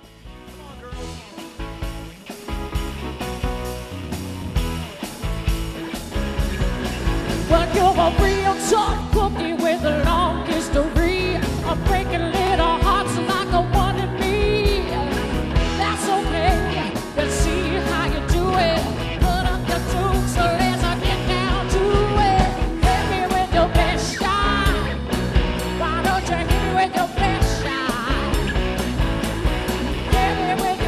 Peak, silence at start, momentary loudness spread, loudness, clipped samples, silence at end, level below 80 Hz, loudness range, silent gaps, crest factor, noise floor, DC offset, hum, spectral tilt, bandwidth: -2 dBFS; 0.05 s; 11 LU; -21 LUFS; under 0.1%; 0 s; -26 dBFS; 8 LU; none; 18 dB; -40 dBFS; under 0.1%; none; -5 dB/octave; 14 kHz